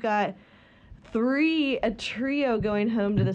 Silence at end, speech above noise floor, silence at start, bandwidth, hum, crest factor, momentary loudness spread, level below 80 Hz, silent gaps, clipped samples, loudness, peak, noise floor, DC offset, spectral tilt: 0 s; 26 dB; 0 s; 9.4 kHz; none; 14 dB; 6 LU; -52 dBFS; none; under 0.1%; -26 LUFS; -12 dBFS; -51 dBFS; under 0.1%; -7 dB/octave